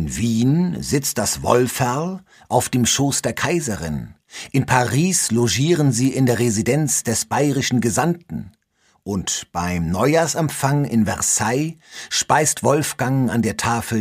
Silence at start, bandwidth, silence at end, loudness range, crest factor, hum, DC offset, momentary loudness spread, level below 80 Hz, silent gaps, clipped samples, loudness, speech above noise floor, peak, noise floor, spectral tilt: 0 s; 15.5 kHz; 0 s; 3 LU; 20 dB; none; under 0.1%; 9 LU; -46 dBFS; none; under 0.1%; -19 LUFS; 43 dB; 0 dBFS; -62 dBFS; -4.5 dB/octave